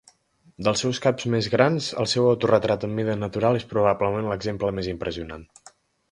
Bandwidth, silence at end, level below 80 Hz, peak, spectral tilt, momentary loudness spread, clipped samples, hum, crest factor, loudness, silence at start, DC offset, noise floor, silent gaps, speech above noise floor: 11.5 kHz; 0.65 s; -50 dBFS; -2 dBFS; -5.5 dB/octave; 9 LU; under 0.1%; none; 22 dB; -23 LUFS; 0.6 s; under 0.1%; -57 dBFS; none; 34 dB